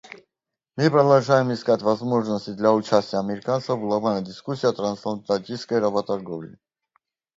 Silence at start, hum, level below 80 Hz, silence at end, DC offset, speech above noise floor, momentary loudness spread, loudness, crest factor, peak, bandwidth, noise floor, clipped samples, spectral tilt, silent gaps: 0.75 s; none; -66 dBFS; 0.85 s; under 0.1%; 64 dB; 12 LU; -22 LUFS; 20 dB; -4 dBFS; 7.8 kHz; -86 dBFS; under 0.1%; -6.5 dB/octave; none